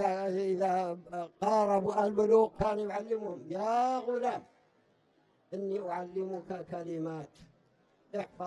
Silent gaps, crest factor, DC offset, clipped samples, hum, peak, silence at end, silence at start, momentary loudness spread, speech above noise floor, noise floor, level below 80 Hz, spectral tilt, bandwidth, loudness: none; 18 dB; under 0.1%; under 0.1%; none; -14 dBFS; 0 s; 0 s; 14 LU; 38 dB; -70 dBFS; -64 dBFS; -6.5 dB/octave; 11 kHz; -32 LUFS